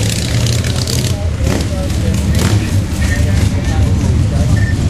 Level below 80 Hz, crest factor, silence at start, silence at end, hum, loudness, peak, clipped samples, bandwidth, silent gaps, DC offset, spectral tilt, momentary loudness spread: -20 dBFS; 12 dB; 0 s; 0 s; none; -14 LUFS; 0 dBFS; under 0.1%; 15 kHz; none; 0.8%; -5.5 dB/octave; 3 LU